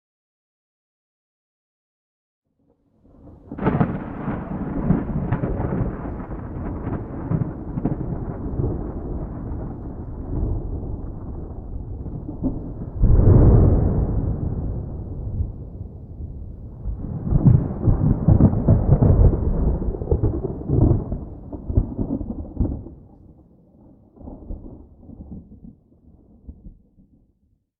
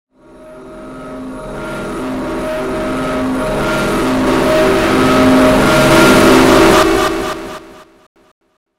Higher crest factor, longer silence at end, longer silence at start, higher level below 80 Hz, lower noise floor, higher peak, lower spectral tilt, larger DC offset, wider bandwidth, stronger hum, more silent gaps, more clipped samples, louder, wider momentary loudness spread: first, 18 dB vs 12 dB; about the same, 1.1 s vs 1 s; first, 3.25 s vs 0.4 s; about the same, -28 dBFS vs -30 dBFS; first, -65 dBFS vs -38 dBFS; second, -4 dBFS vs 0 dBFS; first, -14 dB/octave vs -4.5 dB/octave; neither; second, 3 kHz vs 16.5 kHz; neither; neither; neither; second, -22 LUFS vs -11 LUFS; about the same, 20 LU vs 20 LU